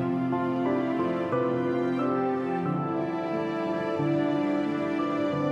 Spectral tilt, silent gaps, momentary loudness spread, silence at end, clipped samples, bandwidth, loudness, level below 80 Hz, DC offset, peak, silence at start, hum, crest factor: -8.5 dB/octave; none; 3 LU; 0 s; under 0.1%; 8 kHz; -28 LUFS; -68 dBFS; under 0.1%; -16 dBFS; 0 s; none; 12 dB